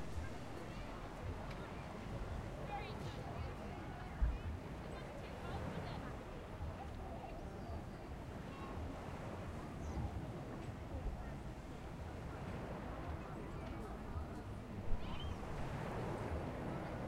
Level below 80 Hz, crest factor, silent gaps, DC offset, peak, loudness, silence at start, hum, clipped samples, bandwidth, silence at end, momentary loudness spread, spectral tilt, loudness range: -50 dBFS; 20 dB; none; under 0.1%; -24 dBFS; -47 LUFS; 0 s; none; under 0.1%; 16 kHz; 0 s; 5 LU; -7 dB/octave; 2 LU